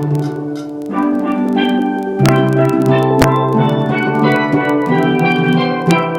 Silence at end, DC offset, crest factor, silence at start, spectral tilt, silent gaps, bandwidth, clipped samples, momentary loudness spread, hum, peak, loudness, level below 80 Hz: 0 s; under 0.1%; 14 dB; 0 s; -7 dB/octave; none; 17 kHz; under 0.1%; 6 LU; none; 0 dBFS; -14 LUFS; -42 dBFS